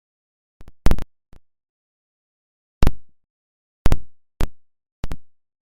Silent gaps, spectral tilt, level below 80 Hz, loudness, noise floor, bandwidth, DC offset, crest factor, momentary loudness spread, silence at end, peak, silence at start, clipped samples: 1.69-2.81 s, 3.30-3.85 s, 4.92-5.03 s; -6.5 dB/octave; -28 dBFS; -28 LUFS; under -90 dBFS; 11.5 kHz; under 0.1%; 18 dB; 14 LU; 0.55 s; -2 dBFS; 0.6 s; under 0.1%